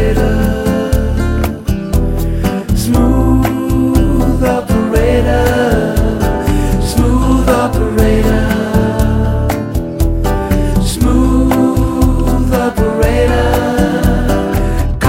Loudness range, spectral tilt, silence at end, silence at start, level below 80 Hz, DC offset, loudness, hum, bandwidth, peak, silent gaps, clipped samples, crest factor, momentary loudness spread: 2 LU; -6.5 dB/octave; 0 s; 0 s; -16 dBFS; under 0.1%; -13 LUFS; none; 16.5 kHz; 0 dBFS; none; under 0.1%; 12 dB; 5 LU